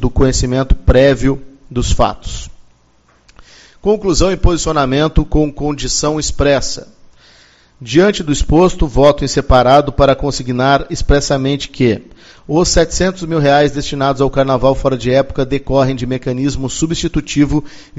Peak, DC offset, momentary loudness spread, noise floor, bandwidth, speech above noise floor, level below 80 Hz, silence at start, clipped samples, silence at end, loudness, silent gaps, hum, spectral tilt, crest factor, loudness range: 0 dBFS; under 0.1%; 7 LU; -52 dBFS; 8 kHz; 39 dB; -22 dBFS; 0 s; 0.1%; 0 s; -14 LUFS; none; none; -5 dB/octave; 14 dB; 5 LU